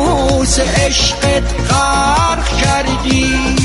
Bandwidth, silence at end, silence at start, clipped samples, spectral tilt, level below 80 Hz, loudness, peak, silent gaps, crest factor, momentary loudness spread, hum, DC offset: 11.5 kHz; 0 s; 0 s; under 0.1%; -4 dB/octave; -20 dBFS; -13 LUFS; 0 dBFS; none; 12 dB; 3 LU; none; under 0.1%